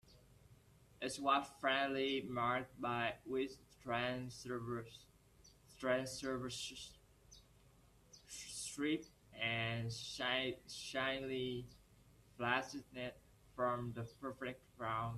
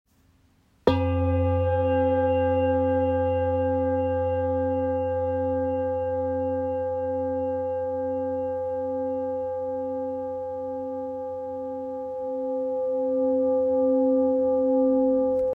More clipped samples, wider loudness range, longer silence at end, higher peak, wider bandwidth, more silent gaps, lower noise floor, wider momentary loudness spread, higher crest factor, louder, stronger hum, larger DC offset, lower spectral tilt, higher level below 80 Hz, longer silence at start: neither; about the same, 6 LU vs 7 LU; about the same, 0 s vs 0 s; second, -20 dBFS vs -4 dBFS; first, 14.5 kHz vs 4.6 kHz; neither; first, -68 dBFS vs -62 dBFS; about the same, 12 LU vs 10 LU; about the same, 22 dB vs 20 dB; second, -41 LUFS vs -25 LUFS; neither; neither; second, -4 dB/octave vs -10 dB/octave; second, -70 dBFS vs -54 dBFS; second, 0.05 s vs 0.85 s